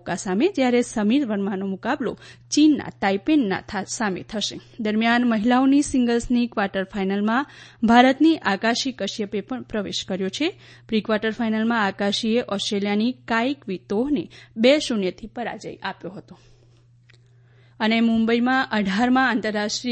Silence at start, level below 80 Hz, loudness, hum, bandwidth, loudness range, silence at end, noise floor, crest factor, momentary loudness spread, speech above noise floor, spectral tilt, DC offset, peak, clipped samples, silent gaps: 0.05 s; -52 dBFS; -22 LUFS; none; 8.8 kHz; 5 LU; 0 s; -54 dBFS; 20 dB; 11 LU; 32 dB; -4.5 dB/octave; under 0.1%; -2 dBFS; under 0.1%; none